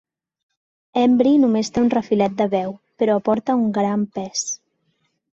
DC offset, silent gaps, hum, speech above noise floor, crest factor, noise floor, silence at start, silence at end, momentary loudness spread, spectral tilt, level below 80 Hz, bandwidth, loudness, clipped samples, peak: under 0.1%; none; none; 51 dB; 16 dB; -69 dBFS; 0.95 s; 0.75 s; 10 LU; -5 dB/octave; -58 dBFS; 8 kHz; -19 LUFS; under 0.1%; -4 dBFS